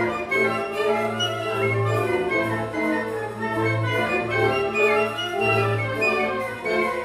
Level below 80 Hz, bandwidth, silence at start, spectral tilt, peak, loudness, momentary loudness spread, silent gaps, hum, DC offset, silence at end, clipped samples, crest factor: -54 dBFS; 15.5 kHz; 0 s; -5.5 dB/octave; -8 dBFS; -23 LUFS; 5 LU; none; none; under 0.1%; 0 s; under 0.1%; 14 dB